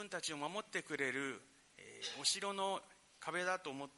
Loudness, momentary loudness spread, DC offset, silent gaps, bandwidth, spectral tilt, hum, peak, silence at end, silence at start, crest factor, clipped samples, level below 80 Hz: -41 LUFS; 12 LU; under 0.1%; none; 11.5 kHz; -1.5 dB/octave; none; -22 dBFS; 0.05 s; 0 s; 20 dB; under 0.1%; -84 dBFS